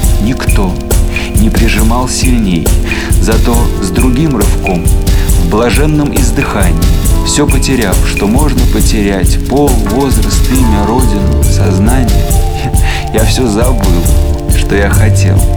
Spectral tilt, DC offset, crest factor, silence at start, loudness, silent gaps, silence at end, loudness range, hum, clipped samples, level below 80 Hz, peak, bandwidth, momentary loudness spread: -5.5 dB/octave; 1%; 8 dB; 0 s; -10 LUFS; none; 0 s; 1 LU; none; under 0.1%; -10 dBFS; 0 dBFS; over 20 kHz; 3 LU